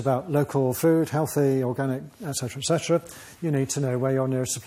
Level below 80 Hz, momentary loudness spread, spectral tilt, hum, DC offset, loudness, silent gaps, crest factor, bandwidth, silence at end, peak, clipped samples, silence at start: -62 dBFS; 8 LU; -5.5 dB/octave; none; under 0.1%; -25 LUFS; none; 16 dB; 16 kHz; 0 s; -10 dBFS; under 0.1%; 0 s